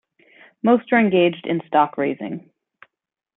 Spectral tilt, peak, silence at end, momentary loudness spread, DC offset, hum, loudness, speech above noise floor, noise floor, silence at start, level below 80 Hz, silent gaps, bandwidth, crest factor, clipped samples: -11 dB/octave; -2 dBFS; 0.95 s; 14 LU; under 0.1%; none; -19 LUFS; 64 dB; -82 dBFS; 0.65 s; -66 dBFS; none; 4 kHz; 18 dB; under 0.1%